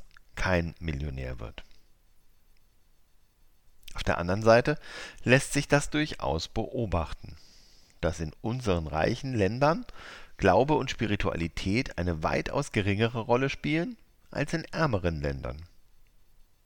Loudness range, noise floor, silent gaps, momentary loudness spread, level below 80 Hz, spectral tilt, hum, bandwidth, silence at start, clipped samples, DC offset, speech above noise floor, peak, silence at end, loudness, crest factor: 9 LU; -60 dBFS; none; 16 LU; -44 dBFS; -5.5 dB/octave; none; 18 kHz; 0 s; under 0.1%; under 0.1%; 32 dB; -6 dBFS; 1 s; -29 LUFS; 24 dB